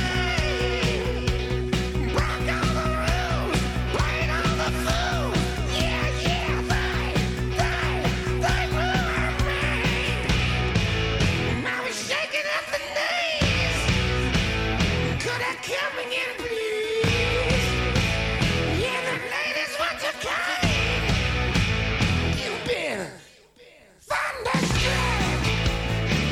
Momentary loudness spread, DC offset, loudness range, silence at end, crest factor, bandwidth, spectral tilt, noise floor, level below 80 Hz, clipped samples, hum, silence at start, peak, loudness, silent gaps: 4 LU; under 0.1%; 2 LU; 0 s; 14 dB; 16 kHz; -4.5 dB/octave; -52 dBFS; -32 dBFS; under 0.1%; none; 0 s; -10 dBFS; -24 LUFS; none